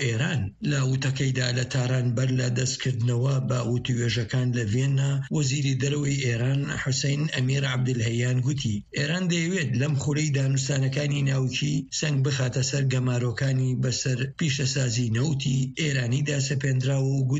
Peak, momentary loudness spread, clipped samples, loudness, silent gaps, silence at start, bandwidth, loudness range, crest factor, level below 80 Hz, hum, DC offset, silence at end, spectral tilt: -12 dBFS; 2 LU; under 0.1%; -25 LUFS; none; 0 s; 8 kHz; 0 LU; 12 dB; -54 dBFS; none; under 0.1%; 0 s; -5 dB/octave